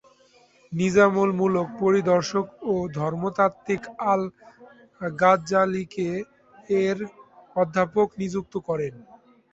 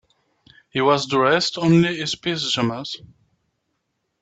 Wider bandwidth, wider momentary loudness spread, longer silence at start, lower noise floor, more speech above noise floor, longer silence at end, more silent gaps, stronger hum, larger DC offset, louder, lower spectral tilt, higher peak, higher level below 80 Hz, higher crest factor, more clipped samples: about the same, 8 kHz vs 8.4 kHz; about the same, 13 LU vs 13 LU; about the same, 0.7 s vs 0.75 s; second, -58 dBFS vs -74 dBFS; second, 34 dB vs 54 dB; second, 0.5 s vs 1.25 s; neither; neither; neither; second, -24 LUFS vs -20 LUFS; first, -6.5 dB/octave vs -5 dB/octave; about the same, -4 dBFS vs -4 dBFS; about the same, -60 dBFS vs -60 dBFS; about the same, 20 dB vs 18 dB; neither